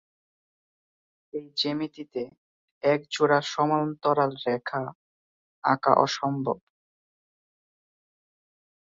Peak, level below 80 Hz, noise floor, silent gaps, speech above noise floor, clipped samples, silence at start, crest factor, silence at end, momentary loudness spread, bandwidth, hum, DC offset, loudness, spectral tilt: -2 dBFS; -72 dBFS; under -90 dBFS; 2.38-2.81 s, 4.95-5.62 s; over 64 dB; under 0.1%; 1.35 s; 26 dB; 2.4 s; 14 LU; 7.8 kHz; none; under 0.1%; -26 LUFS; -5 dB/octave